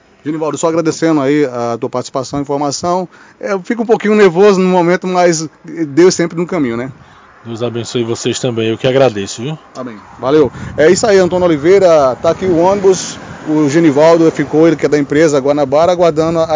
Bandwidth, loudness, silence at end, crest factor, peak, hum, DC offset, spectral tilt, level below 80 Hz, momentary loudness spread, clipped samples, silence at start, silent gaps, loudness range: 7.8 kHz; -12 LUFS; 0 s; 12 dB; 0 dBFS; none; under 0.1%; -5.5 dB/octave; -46 dBFS; 13 LU; 0.1%; 0.25 s; none; 5 LU